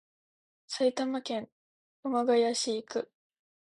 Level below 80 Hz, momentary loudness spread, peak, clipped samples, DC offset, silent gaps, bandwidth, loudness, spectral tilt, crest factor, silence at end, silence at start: -82 dBFS; 14 LU; -16 dBFS; under 0.1%; under 0.1%; 1.52-2.03 s; 11.5 kHz; -31 LUFS; -3 dB/octave; 18 dB; 0.65 s; 0.7 s